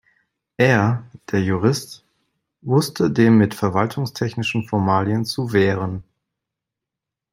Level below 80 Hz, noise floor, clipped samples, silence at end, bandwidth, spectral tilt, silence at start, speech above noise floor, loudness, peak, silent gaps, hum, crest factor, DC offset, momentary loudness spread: -58 dBFS; -85 dBFS; under 0.1%; 1.3 s; 16 kHz; -6.5 dB/octave; 0.6 s; 67 dB; -19 LUFS; -2 dBFS; none; none; 18 dB; under 0.1%; 11 LU